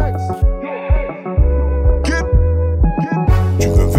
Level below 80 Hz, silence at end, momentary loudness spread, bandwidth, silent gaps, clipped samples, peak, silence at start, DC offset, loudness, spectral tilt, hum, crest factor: -16 dBFS; 0 s; 4 LU; 15 kHz; none; under 0.1%; -2 dBFS; 0 s; under 0.1%; -16 LUFS; -7.5 dB/octave; none; 12 dB